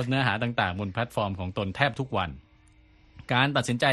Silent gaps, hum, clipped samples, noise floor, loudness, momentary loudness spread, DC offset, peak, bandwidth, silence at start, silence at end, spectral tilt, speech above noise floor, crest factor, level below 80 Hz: none; none; under 0.1%; -57 dBFS; -27 LUFS; 7 LU; under 0.1%; -6 dBFS; 12.5 kHz; 0 s; 0 s; -5.5 dB/octave; 31 dB; 22 dB; -54 dBFS